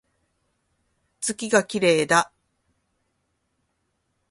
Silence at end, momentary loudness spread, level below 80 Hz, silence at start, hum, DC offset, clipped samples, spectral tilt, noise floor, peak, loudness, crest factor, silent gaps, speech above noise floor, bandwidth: 2.05 s; 10 LU; -68 dBFS; 1.2 s; none; under 0.1%; under 0.1%; -3.5 dB/octave; -74 dBFS; -2 dBFS; -21 LUFS; 24 dB; none; 53 dB; 11.5 kHz